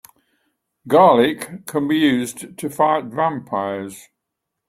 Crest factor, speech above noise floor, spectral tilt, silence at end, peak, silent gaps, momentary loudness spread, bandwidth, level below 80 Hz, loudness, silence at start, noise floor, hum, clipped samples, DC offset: 18 dB; 62 dB; -5 dB/octave; 0.7 s; -2 dBFS; none; 16 LU; 16 kHz; -62 dBFS; -18 LUFS; 0.85 s; -80 dBFS; none; under 0.1%; under 0.1%